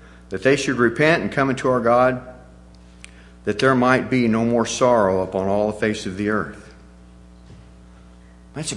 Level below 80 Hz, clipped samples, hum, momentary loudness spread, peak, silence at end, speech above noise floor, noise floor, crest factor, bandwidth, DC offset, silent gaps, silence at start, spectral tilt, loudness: -48 dBFS; under 0.1%; 60 Hz at -45 dBFS; 11 LU; 0 dBFS; 0 s; 27 dB; -45 dBFS; 20 dB; 11.5 kHz; under 0.1%; none; 0.3 s; -5.5 dB/octave; -19 LUFS